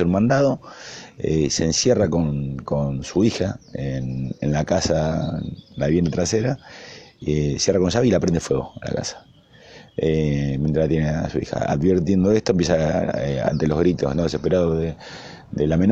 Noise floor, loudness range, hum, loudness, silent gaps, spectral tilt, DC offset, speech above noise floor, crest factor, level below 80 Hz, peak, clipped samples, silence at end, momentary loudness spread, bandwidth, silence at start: -46 dBFS; 3 LU; none; -21 LUFS; none; -6 dB/octave; under 0.1%; 26 dB; 16 dB; -40 dBFS; -4 dBFS; under 0.1%; 0 s; 12 LU; 8.6 kHz; 0 s